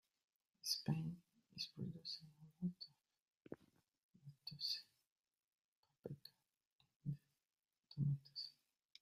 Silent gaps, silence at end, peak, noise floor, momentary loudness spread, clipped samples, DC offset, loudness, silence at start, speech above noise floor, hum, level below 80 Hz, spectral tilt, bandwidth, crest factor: 3.22-3.26 s, 3.37-3.41 s, 4.03-4.09 s, 5.12-5.16 s, 5.44-5.51 s, 5.60-5.83 s, 6.75-6.79 s, 6.96-7.00 s; 0.5 s; -26 dBFS; under -90 dBFS; 17 LU; under 0.1%; under 0.1%; -48 LUFS; 0.65 s; over 44 dB; none; -84 dBFS; -5 dB/octave; 15 kHz; 24 dB